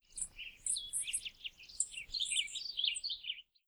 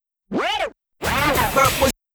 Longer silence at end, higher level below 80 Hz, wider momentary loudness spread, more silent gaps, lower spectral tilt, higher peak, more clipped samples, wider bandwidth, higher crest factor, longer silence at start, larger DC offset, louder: about the same, 0.25 s vs 0.25 s; second, -66 dBFS vs -36 dBFS; second, 9 LU vs 12 LU; neither; second, 4 dB/octave vs -3.5 dB/octave; second, -18 dBFS vs -4 dBFS; neither; about the same, over 20 kHz vs over 20 kHz; about the same, 22 dB vs 18 dB; second, 0.1 s vs 0.3 s; neither; second, -37 LUFS vs -20 LUFS